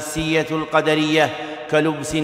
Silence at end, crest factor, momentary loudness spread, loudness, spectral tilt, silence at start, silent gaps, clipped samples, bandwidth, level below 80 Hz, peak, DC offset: 0 s; 16 dB; 4 LU; -19 LUFS; -4.5 dB/octave; 0 s; none; under 0.1%; 16 kHz; -46 dBFS; -2 dBFS; under 0.1%